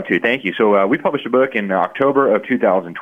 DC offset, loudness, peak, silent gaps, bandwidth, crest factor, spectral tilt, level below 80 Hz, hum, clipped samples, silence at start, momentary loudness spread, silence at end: under 0.1%; -16 LUFS; -2 dBFS; none; 5.2 kHz; 14 dB; -7.5 dB/octave; -64 dBFS; none; under 0.1%; 0 s; 4 LU; 0 s